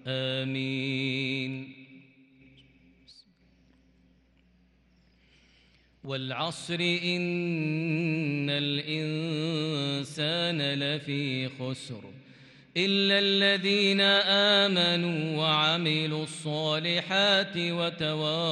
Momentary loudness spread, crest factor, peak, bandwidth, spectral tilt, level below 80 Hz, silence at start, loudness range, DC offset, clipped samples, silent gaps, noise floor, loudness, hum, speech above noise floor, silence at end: 12 LU; 18 dB; -12 dBFS; 11.5 kHz; -5 dB/octave; -72 dBFS; 0.05 s; 12 LU; under 0.1%; under 0.1%; none; -64 dBFS; -27 LUFS; none; 36 dB; 0 s